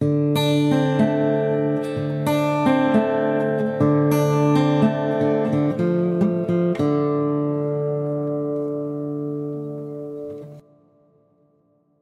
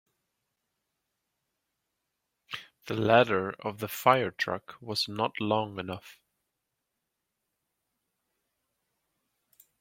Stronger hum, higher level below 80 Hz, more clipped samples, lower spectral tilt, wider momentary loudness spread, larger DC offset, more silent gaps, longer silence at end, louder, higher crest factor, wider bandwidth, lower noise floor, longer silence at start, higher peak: neither; first, -60 dBFS vs -72 dBFS; neither; first, -7.5 dB/octave vs -5 dB/octave; second, 10 LU vs 18 LU; neither; neither; second, 1.4 s vs 3.7 s; first, -21 LUFS vs -28 LUFS; second, 16 dB vs 28 dB; second, 13.5 kHz vs 16.5 kHz; second, -62 dBFS vs -84 dBFS; second, 0 s vs 2.5 s; about the same, -4 dBFS vs -6 dBFS